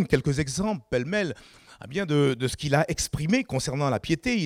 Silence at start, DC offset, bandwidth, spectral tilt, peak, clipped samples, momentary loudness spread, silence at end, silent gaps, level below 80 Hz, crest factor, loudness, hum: 0 s; under 0.1%; 15.5 kHz; -5 dB/octave; -6 dBFS; under 0.1%; 8 LU; 0 s; none; -48 dBFS; 18 dB; -26 LUFS; none